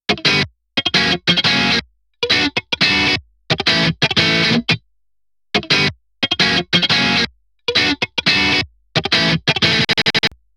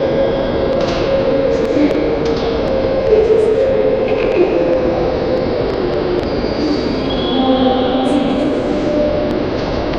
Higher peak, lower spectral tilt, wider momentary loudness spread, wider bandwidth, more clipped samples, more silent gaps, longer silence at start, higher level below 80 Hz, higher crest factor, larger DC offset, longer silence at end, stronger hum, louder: about the same, -2 dBFS vs 0 dBFS; second, -3.5 dB/octave vs -7 dB/octave; first, 8 LU vs 4 LU; first, 15 kHz vs 9.8 kHz; neither; neither; about the same, 0.1 s vs 0 s; second, -46 dBFS vs -30 dBFS; about the same, 16 dB vs 14 dB; neither; first, 0.3 s vs 0 s; neither; about the same, -15 LUFS vs -15 LUFS